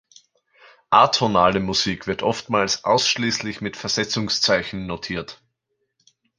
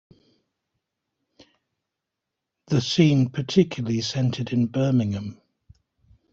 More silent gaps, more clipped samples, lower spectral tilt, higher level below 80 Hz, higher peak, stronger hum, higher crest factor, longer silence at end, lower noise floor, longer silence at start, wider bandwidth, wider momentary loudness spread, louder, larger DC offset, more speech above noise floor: neither; neither; second, -3.5 dB/octave vs -6.5 dB/octave; first, -52 dBFS vs -60 dBFS; about the same, -2 dBFS vs -4 dBFS; neither; about the same, 22 dB vs 20 dB; about the same, 1.05 s vs 1 s; second, -75 dBFS vs -84 dBFS; second, 0.9 s vs 2.7 s; first, 11 kHz vs 7.8 kHz; first, 12 LU vs 8 LU; first, -20 LUFS vs -23 LUFS; neither; second, 54 dB vs 62 dB